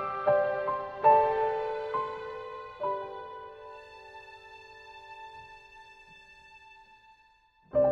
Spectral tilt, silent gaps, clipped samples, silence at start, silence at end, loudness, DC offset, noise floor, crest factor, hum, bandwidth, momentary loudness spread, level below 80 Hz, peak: -6.5 dB/octave; none; under 0.1%; 0 s; 0 s; -29 LUFS; under 0.1%; -64 dBFS; 22 dB; none; 6.6 kHz; 27 LU; -64 dBFS; -10 dBFS